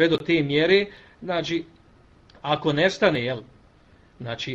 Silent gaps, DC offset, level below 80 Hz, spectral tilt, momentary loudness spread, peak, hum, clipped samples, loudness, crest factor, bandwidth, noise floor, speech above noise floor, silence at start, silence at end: none; under 0.1%; -56 dBFS; -5.5 dB/octave; 15 LU; -6 dBFS; none; under 0.1%; -23 LUFS; 20 dB; 8 kHz; -55 dBFS; 32 dB; 0 s; 0 s